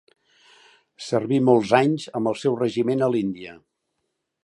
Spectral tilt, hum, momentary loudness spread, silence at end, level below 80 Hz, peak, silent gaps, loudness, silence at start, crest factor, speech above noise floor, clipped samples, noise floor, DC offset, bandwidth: -6.5 dB/octave; none; 14 LU; 0.9 s; -66 dBFS; -2 dBFS; none; -22 LUFS; 1 s; 22 dB; 56 dB; under 0.1%; -77 dBFS; under 0.1%; 11 kHz